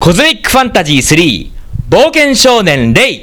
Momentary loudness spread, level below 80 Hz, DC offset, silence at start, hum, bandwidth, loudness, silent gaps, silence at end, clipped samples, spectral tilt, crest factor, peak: 7 LU; -26 dBFS; under 0.1%; 0 s; none; over 20 kHz; -7 LUFS; none; 0 s; 2%; -4 dB/octave; 8 dB; 0 dBFS